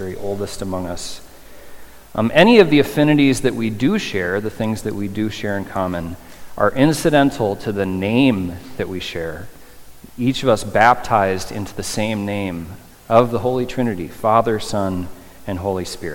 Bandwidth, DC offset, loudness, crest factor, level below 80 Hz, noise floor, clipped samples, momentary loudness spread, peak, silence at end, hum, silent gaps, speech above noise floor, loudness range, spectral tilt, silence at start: 17.5 kHz; under 0.1%; -18 LUFS; 18 dB; -44 dBFS; -39 dBFS; under 0.1%; 14 LU; 0 dBFS; 0 s; none; none; 21 dB; 5 LU; -5.5 dB/octave; 0 s